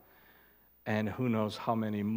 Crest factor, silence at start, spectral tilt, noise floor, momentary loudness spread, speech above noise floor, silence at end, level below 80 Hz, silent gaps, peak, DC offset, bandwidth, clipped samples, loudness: 18 dB; 0.85 s; -7.5 dB/octave; -63 dBFS; 3 LU; 31 dB; 0 s; -72 dBFS; none; -16 dBFS; under 0.1%; 16.5 kHz; under 0.1%; -34 LUFS